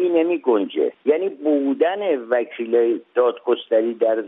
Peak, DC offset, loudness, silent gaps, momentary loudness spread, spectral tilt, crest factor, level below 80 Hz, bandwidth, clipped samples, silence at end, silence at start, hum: -6 dBFS; under 0.1%; -20 LUFS; none; 4 LU; -8.5 dB/octave; 14 dB; -80 dBFS; 3.9 kHz; under 0.1%; 0 s; 0 s; none